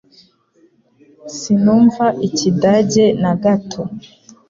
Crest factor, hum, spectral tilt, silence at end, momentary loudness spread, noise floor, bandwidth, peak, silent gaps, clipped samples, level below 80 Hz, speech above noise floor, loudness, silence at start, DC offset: 14 dB; none; -6 dB/octave; 0.5 s; 16 LU; -55 dBFS; 7.6 kHz; -2 dBFS; none; under 0.1%; -54 dBFS; 41 dB; -14 LUFS; 1.25 s; under 0.1%